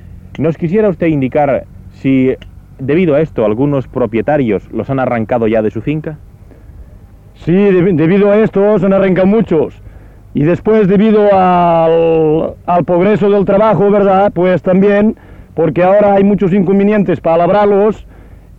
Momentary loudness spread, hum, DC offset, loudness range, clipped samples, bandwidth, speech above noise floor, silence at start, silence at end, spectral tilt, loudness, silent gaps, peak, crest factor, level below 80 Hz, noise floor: 9 LU; none; under 0.1%; 5 LU; under 0.1%; 4.7 kHz; 27 dB; 0.1 s; 0.25 s; -10 dB/octave; -11 LUFS; none; -2 dBFS; 8 dB; -38 dBFS; -37 dBFS